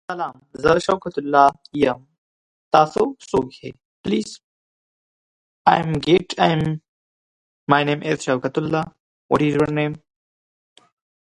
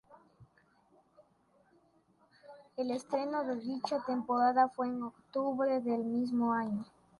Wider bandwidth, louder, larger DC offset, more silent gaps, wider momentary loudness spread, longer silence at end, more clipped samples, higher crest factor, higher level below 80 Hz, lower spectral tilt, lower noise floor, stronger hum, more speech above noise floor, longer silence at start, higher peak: about the same, 11.5 kHz vs 11.5 kHz; first, -20 LUFS vs -34 LUFS; neither; first, 2.18-2.71 s, 3.85-4.04 s, 4.44-5.65 s, 6.88-7.67 s, 9.00-9.29 s vs none; first, 15 LU vs 10 LU; first, 1.3 s vs 0.35 s; neither; about the same, 22 dB vs 18 dB; first, -52 dBFS vs -78 dBFS; about the same, -6 dB/octave vs -6.5 dB/octave; first, under -90 dBFS vs -70 dBFS; neither; first, over 71 dB vs 37 dB; about the same, 0.1 s vs 0.1 s; first, 0 dBFS vs -16 dBFS